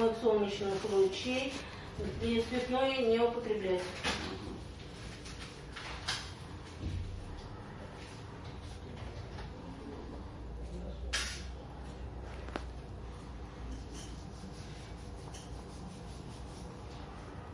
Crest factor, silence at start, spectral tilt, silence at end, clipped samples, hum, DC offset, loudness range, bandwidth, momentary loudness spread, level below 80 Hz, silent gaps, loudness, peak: 20 dB; 0 s; -5 dB/octave; 0 s; under 0.1%; none; under 0.1%; 14 LU; 11.5 kHz; 16 LU; -50 dBFS; none; -38 LUFS; -18 dBFS